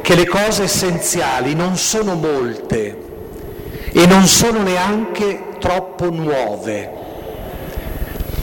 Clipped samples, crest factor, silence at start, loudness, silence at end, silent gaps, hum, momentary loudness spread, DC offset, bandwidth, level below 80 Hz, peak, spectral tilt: under 0.1%; 14 dB; 0 s; -16 LUFS; 0 s; none; none; 19 LU; under 0.1%; 18 kHz; -34 dBFS; -4 dBFS; -4 dB/octave